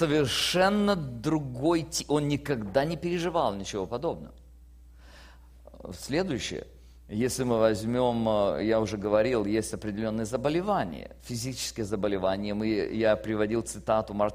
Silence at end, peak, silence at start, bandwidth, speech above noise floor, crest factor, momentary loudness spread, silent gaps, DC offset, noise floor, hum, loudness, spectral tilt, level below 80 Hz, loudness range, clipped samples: 0 s; -10 dBFS; 0 s; 15.5 kHz; 24 dB; 18 dB; 9 LU; none; under 0.1%; -51 dBFS; none; -28 LUFS; -5 dB/octave; -50 dBFS; 7 LU; under 0.1%